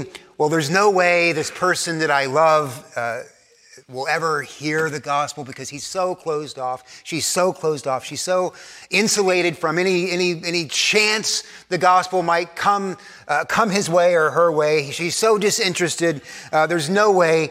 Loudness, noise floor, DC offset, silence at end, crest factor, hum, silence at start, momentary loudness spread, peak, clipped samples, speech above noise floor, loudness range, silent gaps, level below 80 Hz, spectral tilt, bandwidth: -19 LUFS; -49 dBFS; under 0.1%; 0 s; 18 dB; none; 0 s; 12 LU; -2 dBFS; under 0.1%; 30 dB; 6 LU; none; -66 dBFS; -3.5 dB/octave; 16 kHz